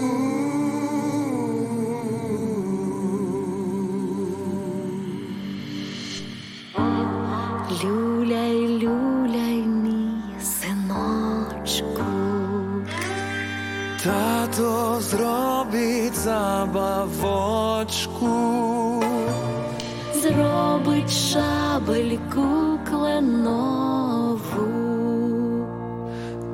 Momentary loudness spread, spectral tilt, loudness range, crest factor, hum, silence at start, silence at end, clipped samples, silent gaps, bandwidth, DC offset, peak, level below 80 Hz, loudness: 8 LU; -5 dB/octave; 5 LU; 16 dB; none; 0 s; 0 s; under 0.1%; none; 16.5 kHz; under 0.1%; -8 dBFS; -48 dBFS; -24 LUFS